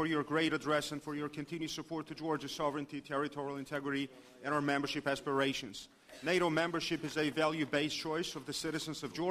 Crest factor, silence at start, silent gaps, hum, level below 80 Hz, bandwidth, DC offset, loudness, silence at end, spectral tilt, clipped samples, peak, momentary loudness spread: 20 dB; 0 s; none; none; -68 dBFS; 15.5 kHz; under 0.1%; -36 LUFS; 0 s; -4.5 dB/octave; under 0.1%; -18 dBFS; 9 LU